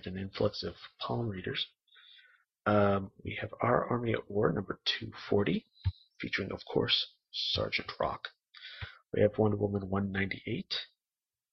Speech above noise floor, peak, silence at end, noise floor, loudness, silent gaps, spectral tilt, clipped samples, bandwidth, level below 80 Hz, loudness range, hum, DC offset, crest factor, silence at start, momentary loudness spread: over 58 dB; -12 dBFS; 0.65 s; under -90 dBFS; -33 LUFS; none; -6.5 dB/octave; under 0.1%; 6.4 kHz; -58 dBFS; 2 LU; none; under 0.1%; 22 dB; 0.05 s; 13 LU